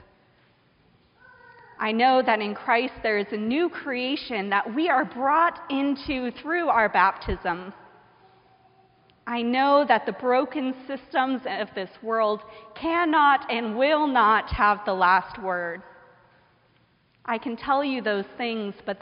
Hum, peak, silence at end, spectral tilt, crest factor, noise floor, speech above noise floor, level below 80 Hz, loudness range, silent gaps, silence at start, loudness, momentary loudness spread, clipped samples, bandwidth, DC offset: none; -4 dBFS; 0.05 s; -2 dB/octave; 20 dB; -63 dBFS; 39 dB; -50 dBFS; 5 LU; none; 1.8 s; -24 LUFS; 11 LU; under 0.1%; 5.4 kHz; under 0.1%